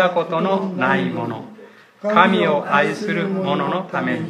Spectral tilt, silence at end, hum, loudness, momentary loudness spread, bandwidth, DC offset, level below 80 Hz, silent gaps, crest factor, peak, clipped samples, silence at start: -6.5 dB/octave; 0 s; none; -19 LUFS; 12 LU; 10.5 kHz; under 0.1%; -70 dBFS; none; 20 dB; 0 dBFS; under 0.1%; 0 s